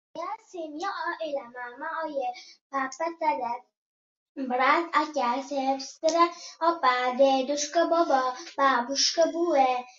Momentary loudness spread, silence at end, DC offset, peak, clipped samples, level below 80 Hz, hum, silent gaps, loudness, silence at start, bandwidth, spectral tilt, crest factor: 14 LU; 0.05 s; under 0.1%; -8 dBFS; under 0.1%; -80 dBFS; none; 2.61-2.70 s, 3.77-4.35 s; -26 LUFS; 0.15 s; 7.8 kHz; -1 dB/octave; 18 dB